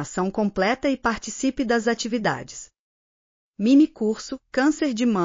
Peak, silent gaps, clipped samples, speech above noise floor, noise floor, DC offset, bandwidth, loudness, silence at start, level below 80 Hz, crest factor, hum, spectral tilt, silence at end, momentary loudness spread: -8 dBFS; 2.79-3.54 s; under 0.1%; over 68 dB; under -90 dBFS; under 0.1%; 7.4 kHz; -23 LUFS; 0 s; -54 dBFS; 16 dB; none; -4.5 dB/octave; 0 s; 10 LU